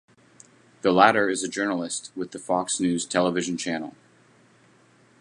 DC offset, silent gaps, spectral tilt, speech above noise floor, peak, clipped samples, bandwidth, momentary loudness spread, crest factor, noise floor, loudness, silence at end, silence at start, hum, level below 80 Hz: under 0.1%; none; -3.5 dB/octave; 34 dB; -2 dBFS; under 0.1%; 11.5 kHz; 14 LU; 24 dB; -58 dBFS; -24 LUFS; 1.3 s; 0.85 s; none; -66 dBFS